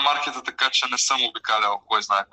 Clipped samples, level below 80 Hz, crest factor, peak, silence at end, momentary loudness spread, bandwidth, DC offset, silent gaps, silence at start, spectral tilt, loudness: under 0.1%; -72 dBFS; 16 dB; -6 dBFS; 0.1 s; 4 LU; 12.5 kHz; under 0.1%; none; 0 s; 1.5 dB/octave; -21 LUFS